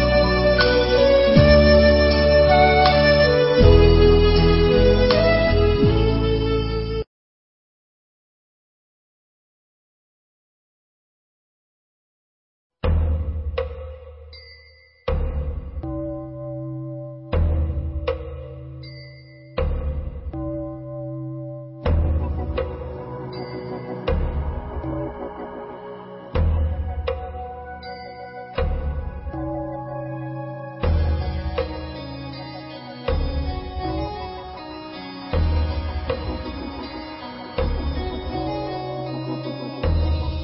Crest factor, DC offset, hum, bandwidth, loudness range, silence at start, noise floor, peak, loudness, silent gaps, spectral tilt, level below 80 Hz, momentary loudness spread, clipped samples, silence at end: 20 dB; under 0.1%; none; 5.8 kHz; 15 LU; 0 s; -51 dBFS; 0 dBFS; -21 LUFS; 7.07-12.70 s; -9.5 dB/octave; -26 dBFS; 20 LU; under 0.1%; 0 s